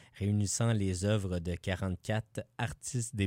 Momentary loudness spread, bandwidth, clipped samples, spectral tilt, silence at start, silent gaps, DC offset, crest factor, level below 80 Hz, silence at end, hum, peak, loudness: 7 LU; 16 kHz; under 0.1%; -5.5 dB/octave; 0.15 s; none; under 0.1%; 16 dB; -54 dBFS; 0 s; none; -18 dBFS; -34 LUFS